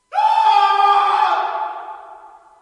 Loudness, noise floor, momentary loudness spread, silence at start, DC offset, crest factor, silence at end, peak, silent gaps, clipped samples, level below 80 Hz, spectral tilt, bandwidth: -15 LUFS; -42 dBFS; 19 LU; 0.1 s; under 0.1%; 14 dB; 0.35 s; -2 dBFS; none; under 0.1%; -74 dBFS; 0 dB/octave; 10.5 kHz